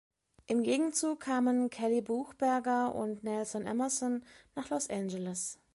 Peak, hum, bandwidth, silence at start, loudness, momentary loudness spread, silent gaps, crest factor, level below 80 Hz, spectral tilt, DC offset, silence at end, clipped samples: -18 dBFS; none; 11.5 kHz; 0.5 s; -33 LUFS; 7 LU; none; 16 dB; -72 dBFS; -4 dB/octave; under 0.1%; 0.2 s; under 0.1%